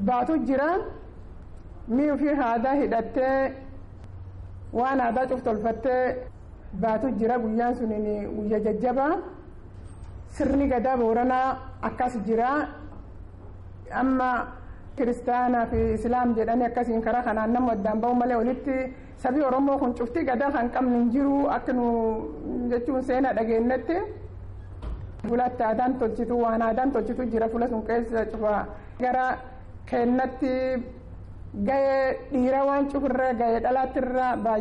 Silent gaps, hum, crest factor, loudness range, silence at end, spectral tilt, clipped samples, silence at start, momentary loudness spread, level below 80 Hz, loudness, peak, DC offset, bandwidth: none; none; 10 dB; 3 LU; 0 s; -8 dB/octave; under 0.1%; 0 s; 19 LU; -44 dBFS; -25 LUFS; -16 dBFS; under 0.1%; 10.5 kHz